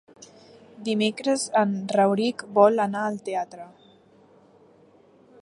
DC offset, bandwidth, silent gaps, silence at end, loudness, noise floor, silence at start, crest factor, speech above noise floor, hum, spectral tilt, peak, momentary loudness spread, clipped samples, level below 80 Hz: under 0.1%; 11.5 kHz; none; 1.75 s; -23 LUFS; -56 dBFS; 0.2 s; 22 dB; 33 dB; none; -5 dB/octave; -4 dBFS; 12 LU; under 0.1%; -78 dBFS